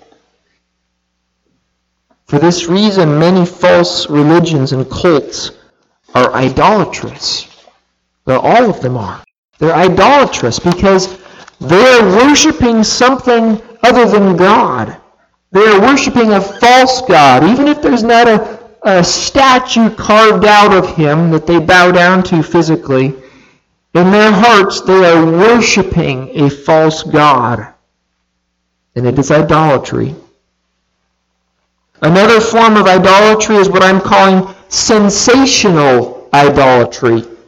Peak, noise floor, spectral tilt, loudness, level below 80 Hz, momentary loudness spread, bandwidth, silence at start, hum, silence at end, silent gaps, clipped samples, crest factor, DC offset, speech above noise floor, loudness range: 0 dBFS; -65 dBFS; -4.5 dB/octave; -8 LUFS; -38 dBFS; 10 LU; 14 kHz; 2.3 s; none; 0.15 s; 9.38-9.48 s; under 0.1%; 10 dB; under 0.1%; 58 dB; 6 LU